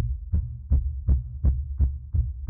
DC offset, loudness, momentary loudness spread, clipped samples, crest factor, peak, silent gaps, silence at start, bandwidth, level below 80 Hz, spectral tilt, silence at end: under 0.1%; -28 LUFS; 3 LU; under 0.1%; 14 dB; -12 dBFS; none; 0 s; 1.2 kHz; -26 dBFS; -14 dB/octave; 0 s